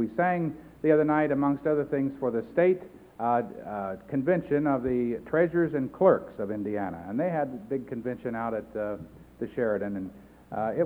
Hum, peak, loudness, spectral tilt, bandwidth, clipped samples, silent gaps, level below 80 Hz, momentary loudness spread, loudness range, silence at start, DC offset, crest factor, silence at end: none; -8 dBFS; -28 LUFS; -10 dB/octave; 4.5 kHz; under 0.1%; none; -58 dBFS; 11 LU; 6 LU; 0 s; under 0.1%; 20 dB; 0 s